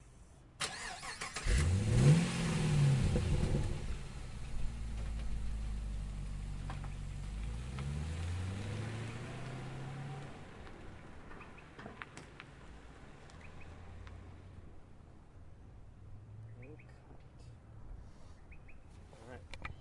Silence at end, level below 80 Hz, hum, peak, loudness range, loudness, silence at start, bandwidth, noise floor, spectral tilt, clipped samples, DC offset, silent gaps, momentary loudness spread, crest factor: 0 s; -44 dBFS; none; -16 dBFS; 23 LU; -37 LUFS; 0 s; 11.5 kHz; -58 dBFS; -6 dB/octave; under 0.1%; under 0.1%; none; 25 LU; 22 dB